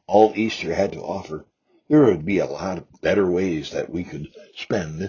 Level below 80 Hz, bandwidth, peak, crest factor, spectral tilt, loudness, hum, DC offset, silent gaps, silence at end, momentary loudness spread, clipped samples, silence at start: -48 dBFS; 7.2 kHz; -2 dBFS; 20 dB; -6.5 dB/octave; -22 LUFS; none; under 0.1%; none; 0 s; 18 LU; under 0.1%; 0.1 s